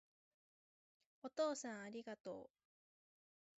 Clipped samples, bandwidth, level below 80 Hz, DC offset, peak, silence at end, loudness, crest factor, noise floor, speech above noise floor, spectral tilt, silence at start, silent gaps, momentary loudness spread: under 0.1%; 7.6 kHz; under -90 dBFS; under 0.1%; -30 dBFS; 1.1 s; -48 LUFS; 20 dB; under -90 dBFS; over 43 dB; -3 dB/octave; 1.25 s; 2.20-2.24 s; 14 LU